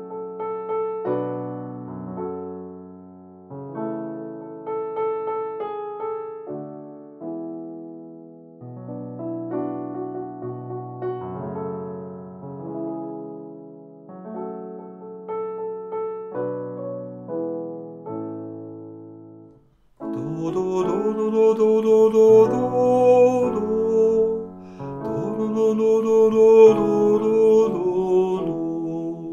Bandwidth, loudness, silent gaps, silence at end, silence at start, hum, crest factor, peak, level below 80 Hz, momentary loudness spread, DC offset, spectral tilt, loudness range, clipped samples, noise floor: 7.4 kHz; -22 LUFS; none; 0 s; 0 s; none; 20 dB; -2 dBFS; -62 dBFS; 21 LU; under 0.1%; -8 dB/octave; 16 LU; under 0.1%; -55 dBFS